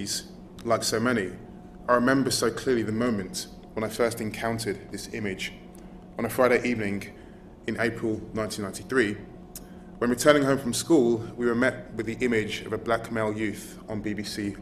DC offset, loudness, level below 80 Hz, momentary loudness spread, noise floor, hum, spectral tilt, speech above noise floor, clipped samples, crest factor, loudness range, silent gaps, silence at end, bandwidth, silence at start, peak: under 0.1%; -27 LUFS; -52 dBFS; 17 LU; -46 dBFS; none; -4.5 dB/octave; 20 dB; under 0.1%; 24 dB; 5 LU; none; 0 s; 14 kHz; 0 s; -4 dBFS